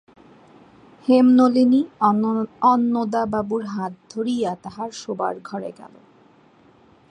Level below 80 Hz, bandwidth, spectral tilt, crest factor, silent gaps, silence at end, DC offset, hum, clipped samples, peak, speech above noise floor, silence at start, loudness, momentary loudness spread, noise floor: -62 dBFS; 9.2 kHz; -6.5 dB/octave; 18 dB; none; 1.25 s; under 0.1%; none; under 0.1%; -4 dBFS; 34 dB; 1.05 s; -20 LUFS; 16 LU; -53 dBFS